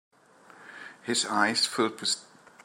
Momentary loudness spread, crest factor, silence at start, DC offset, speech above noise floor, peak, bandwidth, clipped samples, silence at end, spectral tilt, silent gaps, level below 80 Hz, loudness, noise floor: 20 LU; 22 dB; 0.6 s; under 0.1%; 28 dB; -10 dBFS; 16 kHz; under 0.1%; 0.4 s; -1.5 dB/octave; none; -84 dBFS; -27 LUFS; -55 dBFS